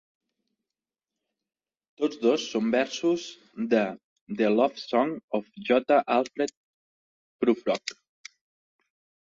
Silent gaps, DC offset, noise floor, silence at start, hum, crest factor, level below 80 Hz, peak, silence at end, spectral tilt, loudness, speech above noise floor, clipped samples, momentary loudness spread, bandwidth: 4.04-4.26 s, 5.24-5.28 s, 6.57-7.39 s; under 0.1%; under -90 dBFS; 2 s; none; 20 dB; -74 dBFS; -8 dBFS; 1.35 s; -4.5 dB/octave; -26 LUFS; over 64 dB; under 0.1%; 11 LU; 7.8 kHz